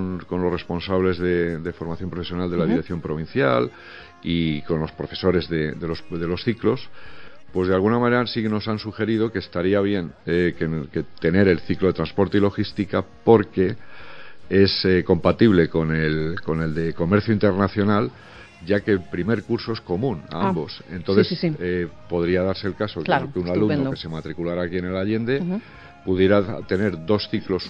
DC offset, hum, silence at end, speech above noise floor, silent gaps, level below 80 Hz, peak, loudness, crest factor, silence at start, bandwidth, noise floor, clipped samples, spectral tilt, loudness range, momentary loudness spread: under 0.1%; none; 0 s; 22 dB; none; -46 dBFS; 0 dBFS; -22 LUFS; 22 dB; 0 s; 7.2 kHz; -44 dBFS; under 0.1%; -8.5 dB/octave; 4 LU; 11 LU